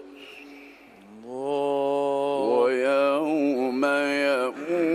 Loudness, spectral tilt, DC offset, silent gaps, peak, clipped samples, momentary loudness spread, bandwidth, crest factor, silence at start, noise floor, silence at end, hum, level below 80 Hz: -24 LUFS; -5 dB/octave; under 0.1%; none; -10 dBFS; under 0.1%; 21 LU; 14.5 kHz; 16 dB; 0 s; -49 dBFS; 0 s; none; -74 dBFS